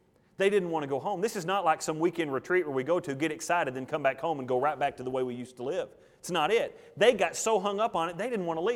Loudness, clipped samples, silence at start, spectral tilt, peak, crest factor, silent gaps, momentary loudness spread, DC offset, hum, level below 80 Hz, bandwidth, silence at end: -29 LUFS; under 0.1%; 0.4 s; -4 dB/octave; -10 dBFS; 20 dB; none; 8 LU; under 0.1%; none; -70 dBFS; 17 kHz; 0 s